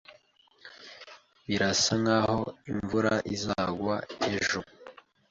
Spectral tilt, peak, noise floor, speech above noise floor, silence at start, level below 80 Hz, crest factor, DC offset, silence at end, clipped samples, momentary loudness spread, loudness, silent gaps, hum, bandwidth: -4 dB/octave; -14 dBFS; -62 dBFS; 34 dB; 0.1 s; -56 dBFS; 18 dB; under 0.1%; 0.4 s; under 0.1%; 22 LU; -28 LUFS; none; none; 8.4 kHz